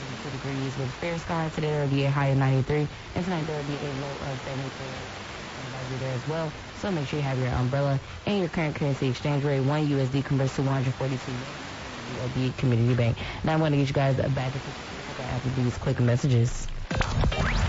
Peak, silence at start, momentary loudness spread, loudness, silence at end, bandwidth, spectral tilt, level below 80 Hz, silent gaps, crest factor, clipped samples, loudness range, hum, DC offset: -10 dBFS; 0 s; 11 LU; -28 LUFS; 0 s; 8 kHz; -6.5 dB/octave; -40 dBFS; none; 16 dB; under 0.1%; 6 LU; none; under 0.1%